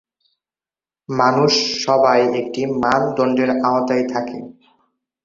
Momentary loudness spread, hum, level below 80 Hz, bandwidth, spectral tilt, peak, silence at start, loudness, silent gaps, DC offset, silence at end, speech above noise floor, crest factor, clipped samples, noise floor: 10 LU; none; -58 dBFS; 7.6 kHz; -4.5 dB/octave; -2 dBFS; 1.1 s; -17 LUFS; none; under 0.1%; 0.75 s; over 73 dB; 16 dB; under 0.1%; under -90 dBFS